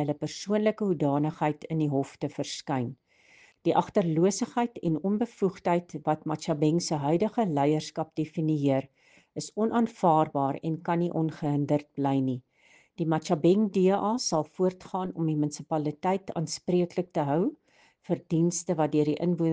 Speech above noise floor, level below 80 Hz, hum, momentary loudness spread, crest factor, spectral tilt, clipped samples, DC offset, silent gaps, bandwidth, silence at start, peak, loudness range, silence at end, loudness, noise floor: 34 dB; -68 dBFS; none; 8 LU; 18 dB; -6.5 dB/octave; under 0.1%; under 0.1%; none; 9.8 kHz; 0 s; -10 dBFS; 2 LU; 0 s; -28 LUFS; -62 dBFS